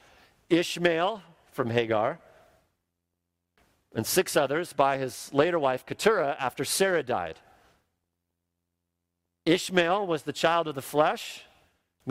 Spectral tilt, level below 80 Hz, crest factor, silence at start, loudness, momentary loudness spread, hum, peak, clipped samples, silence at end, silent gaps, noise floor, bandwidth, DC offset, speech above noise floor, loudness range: -4 dB/octave; -68 dBFS; 22 dB; 0.5 s; -27 LUFS; 11 LU; none; -6 dBFS; under 0.1%; 0 s; none; -83 dBFS; 16 kHz; under 0.1%; 56 dB; 4 LU